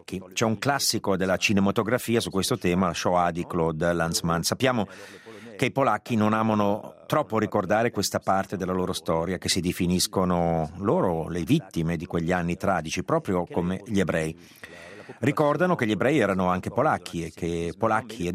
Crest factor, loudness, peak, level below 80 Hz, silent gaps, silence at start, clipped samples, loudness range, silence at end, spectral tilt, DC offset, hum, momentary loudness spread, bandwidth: 18 dB; -25 LUFS; -6 dBFS; -56 dBFS; none; 0.1 s; under 0.1%; 2 LU; 0 s; -5 dB/octave; under 0.1%; none; 7 LU; 16 kHz